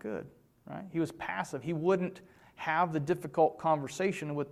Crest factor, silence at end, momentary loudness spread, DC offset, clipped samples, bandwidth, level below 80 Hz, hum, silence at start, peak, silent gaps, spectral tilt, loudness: 18 dB; 0 s; 12 LU; under 0.1%; under 0.1%; 14.5 kHz; -70 dBFS; none; 0.05 s; -14 dBFS; none; -6.5 dB/octave; -32 LUFS